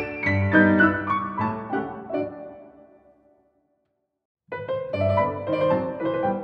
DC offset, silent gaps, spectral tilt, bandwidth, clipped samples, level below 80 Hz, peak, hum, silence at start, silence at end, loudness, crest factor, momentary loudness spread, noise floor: under 0.1%; 4.25-4.35 s; -9 dB/octave; 6.4 kHz; under 0.1%; -58 dBFS; -4 dBFS; none; 0 s; 0 s; -23 LUFS; 20 dB; 15 LU; -75 dBFS